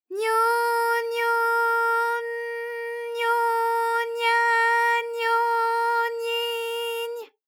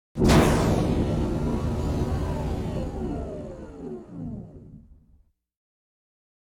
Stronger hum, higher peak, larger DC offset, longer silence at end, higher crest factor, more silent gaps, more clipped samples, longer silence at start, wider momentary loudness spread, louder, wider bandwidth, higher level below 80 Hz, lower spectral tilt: neither; second, -12 dBFS vs -6 dBFS; neither; second, 0.2 s vs 1.6 s; second, 12 dB vs 20 dB; neither; neither; about the same, 0.1 s vs 0.15 s; second, 11 LU vs 19 LU; about the same, -23 LUFS vs -25 LUFS; about the same, 20 kHz vs 18.5 kHz; second, under -90 dBFS vs -34 dBFS; second, 3 dB/octave vs -6.5 dB/octave